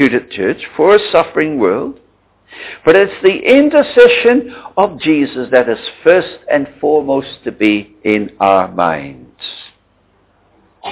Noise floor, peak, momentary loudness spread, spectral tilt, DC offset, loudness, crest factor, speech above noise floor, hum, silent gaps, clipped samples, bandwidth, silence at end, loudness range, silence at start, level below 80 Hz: -54 dBFS; 0 dBFS; 17 LU; -9 dB/octave; under 0.1%; -12 LUFS; 12 dB; 42 dB; 50 Hz at -50 dBFS; none; 0.1%; 4 kHz; 0 s; 6 LU; 0 s; -50 dBFS